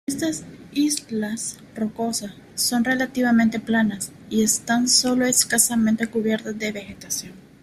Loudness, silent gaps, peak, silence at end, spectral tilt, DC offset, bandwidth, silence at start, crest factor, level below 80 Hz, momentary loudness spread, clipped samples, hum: -21 LUFS; none; -4 dBFS; 0.2 s; -2.5 dB/octave; under 0.1%; 15.5 kHz; 0.1 s; 20 dB; -58 dBFS; 12 LU; under 0.1%; none